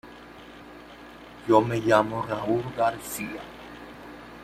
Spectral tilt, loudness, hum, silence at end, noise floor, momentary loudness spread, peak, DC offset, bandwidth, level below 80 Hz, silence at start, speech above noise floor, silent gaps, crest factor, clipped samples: -5.5 dB/octave; -25 LUFS; none; 0 s; -46 dBFS; 23 LU; -4 dBFS; under 0.1%; 15.5 kHz; -58 dBFS; 0.05 s; 21 dB; none; 24 dB; under 0.1%